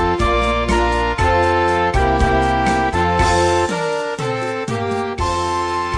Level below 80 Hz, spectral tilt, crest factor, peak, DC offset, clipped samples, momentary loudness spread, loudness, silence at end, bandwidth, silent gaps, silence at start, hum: -26 dBFS; -5 dB/octave; 14 dB; -2 dBFS; under 0.1%; under 0.1%; 6 LU; -17 LUFS; 0 s; 10.5 kHz; none; 0 s; none